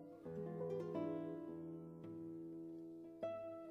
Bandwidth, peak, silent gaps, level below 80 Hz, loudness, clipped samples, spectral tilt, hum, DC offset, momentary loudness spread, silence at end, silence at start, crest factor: 7.2 kHz; -34 dBFS; none; -82 dBFS; -49 LUFS; under 0.1%; -9.5 dB/octave; none; under 0.1%; 9 LU; 0 s; 0 s; 16 dB